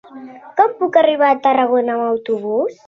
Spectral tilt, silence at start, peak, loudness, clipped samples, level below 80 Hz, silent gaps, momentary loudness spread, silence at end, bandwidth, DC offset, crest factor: -6 dB/octave; 0.1 s; 0 dBFS; -16 LUFS; under 0.1%; -68 dBFS; none; 7 LU; 0.15 s; 6.8 kHz; under 0.1%; 16 dB